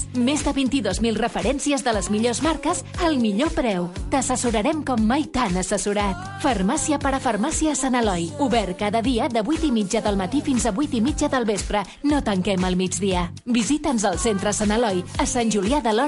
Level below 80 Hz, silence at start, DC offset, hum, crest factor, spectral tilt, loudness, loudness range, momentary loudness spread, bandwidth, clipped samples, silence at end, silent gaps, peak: -36 dBFS; 0 s; under 0.1%; none; 14 dB; -4.5 dB/octave; -22 LUFS; 0 LU; 3 LU; 11.5 kHz; under 0.1%; 0 s; none; -8 dBFS